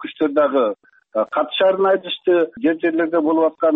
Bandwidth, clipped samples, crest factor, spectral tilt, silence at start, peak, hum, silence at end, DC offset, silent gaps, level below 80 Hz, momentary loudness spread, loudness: 4 kHz; under 0.1%; 10 dB; -7.5 dB/octave; 0 s; -8 dBFS; none; 0 s; under 0.1%; none; -66 dBFS; 6 LU; -18 LUFS